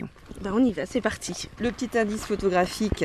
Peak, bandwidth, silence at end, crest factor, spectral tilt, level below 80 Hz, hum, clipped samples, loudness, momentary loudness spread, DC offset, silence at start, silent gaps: -8 dBFS; 13.5 kHz; 0 s; 18 dB; -5 dB/octave; -44 dBFS; none; under 0.1%; -26 LUFS; 9 LU; under 0.1%; 0 s; none